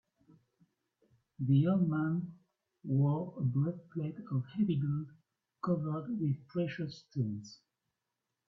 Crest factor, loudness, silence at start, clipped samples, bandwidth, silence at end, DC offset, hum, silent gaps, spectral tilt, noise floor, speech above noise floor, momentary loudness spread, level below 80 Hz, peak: 16 dB; -34 LUFS; 1.4 s; under 0.1%; 6.4 kHz; 0.95 s; under 0.1%; none; none; -9.5 dB/octave; -88 dBFS; 55 dB; 11 LU; -72 dBFS; -18 dBFS